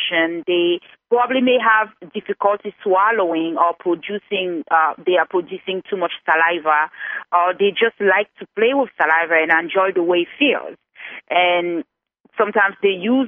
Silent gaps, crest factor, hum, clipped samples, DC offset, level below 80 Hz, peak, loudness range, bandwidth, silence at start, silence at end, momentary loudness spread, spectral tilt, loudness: 12.20-12.24 s; 16 dB; none; under 0.1%; under 0.1%; -72 dBFS; -2 dBFS; 2 LU; 3.8 kHz; 0 s; 0 s; 10 LU; -7.5 dB/octave; -18 LUFS